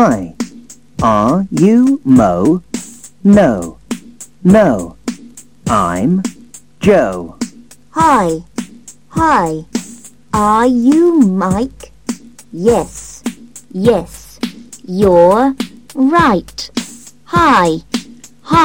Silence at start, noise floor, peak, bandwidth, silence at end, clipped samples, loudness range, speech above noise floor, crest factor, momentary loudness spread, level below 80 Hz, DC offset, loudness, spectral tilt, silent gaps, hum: 0 s; -39 dBFS; 0 dBFS; 17 kHz; 0 s; under 0.1%; 4 LU; 28 dB; 14 dB; 17 LU; -38 dBFS; 0.6%; -12 LUFS; -6 dB/octave; none; 50 Hz at -50 dBFS